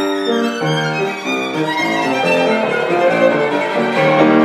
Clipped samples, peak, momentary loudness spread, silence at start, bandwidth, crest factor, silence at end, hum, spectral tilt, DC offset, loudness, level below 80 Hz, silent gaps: under 0.1%; 0 dBFS; 5 LU; 0 s; 14 kHz; 14 dB; 0 s; none; -5.5 dB/octave; under 0.1%; -15 LUFS; -62 dBFS; none